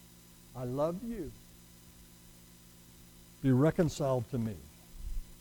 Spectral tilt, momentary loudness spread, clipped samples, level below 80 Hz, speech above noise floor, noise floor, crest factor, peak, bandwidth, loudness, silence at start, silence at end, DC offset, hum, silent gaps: -7.5 dB/octave; 27 LU; under 0.1%; -50 dBFS; 25 dB; -57 dBFS; 20 dB; -16 dBFS; 19 kHz; -33 LUFS; 0 s; 0.05 s; under 0.1%; 60 Hz at -60 dBFS; none